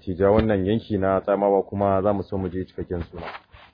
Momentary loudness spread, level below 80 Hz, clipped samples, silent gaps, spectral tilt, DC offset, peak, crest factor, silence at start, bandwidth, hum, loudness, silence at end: 14 LU; -44 dBFS; under 0.1%; none; -11 dB/octave; under 0.1%; -6 dBFS; 18 dB; 0.05 s; 5.2 kHz; none; -23 LUFS; 0.35 s